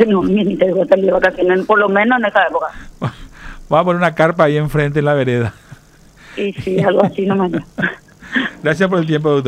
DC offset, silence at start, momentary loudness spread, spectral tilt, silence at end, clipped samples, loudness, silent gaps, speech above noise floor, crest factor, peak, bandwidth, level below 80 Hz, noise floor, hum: under 0.1%; 0 s; 10 LU; -7.5 dB/octave; 0 s; under 0.1%; -15 LUFS; none; 30 dB; 14 dB; 0 dBFS; 14 kHz; -42 dBFS; -44 dBFS; none